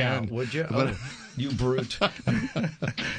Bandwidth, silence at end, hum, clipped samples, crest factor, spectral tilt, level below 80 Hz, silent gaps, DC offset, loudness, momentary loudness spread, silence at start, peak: 10 kHz; 0 s; none; under 0.1%; 18 dB; -6 dB/octave; -50 dBFS; none; under 0.1%; -28 LUFS; 6 LU; 0 s; -10 dBFS